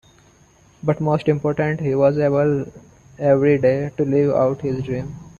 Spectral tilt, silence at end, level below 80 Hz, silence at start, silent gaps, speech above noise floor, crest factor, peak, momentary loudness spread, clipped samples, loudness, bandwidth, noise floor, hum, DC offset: -9 dB/octave; 0.1 s; -50 dBFS; 0.85 s; none; 34 dB; 16 dB; -4 dBFS; 10 LU; under 0.1%; -19 LUFS; 7.2 kHz; -53 dBFS; none; under 0.1%